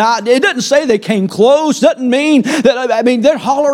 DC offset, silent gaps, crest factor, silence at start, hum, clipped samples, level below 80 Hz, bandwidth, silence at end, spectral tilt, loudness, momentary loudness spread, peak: under 0.1%; none; 10 dB; 0 s; none; under 0.1%; -58 dBFS; 15.5 kHz; 0 s; -4.5 dB/octave; -11 LUFS; 3 LU; 0 dBFS